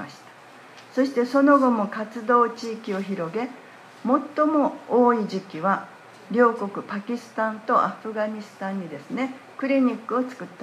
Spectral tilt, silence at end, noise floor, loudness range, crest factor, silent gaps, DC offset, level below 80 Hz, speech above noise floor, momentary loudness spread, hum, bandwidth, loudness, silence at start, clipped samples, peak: -6.5 dB/octave; 0 s; -47 dBFS; 3 LU; 18 dB; none; under 0.1%; -80 dBFS; 24 dB; 13 LU; none; 12 kHz; -24 LUFS; 0 s; under 0.1%; -6 dBFS